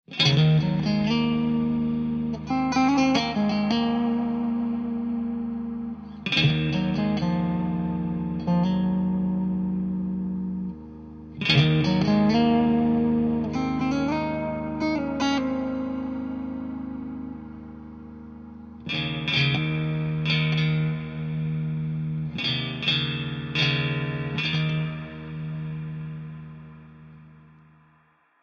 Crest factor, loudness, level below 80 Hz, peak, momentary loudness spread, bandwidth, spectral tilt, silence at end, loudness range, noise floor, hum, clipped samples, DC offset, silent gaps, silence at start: 18 dB; -25 LUFS; -48 dBFS; -6 dBFS; 15 LU; 6.8 kHz; -6.5 dB/octave; 1.1 s; 8 LU; -62 dBFS; none; under 0.1%; under 0.1%; none; 0.1 s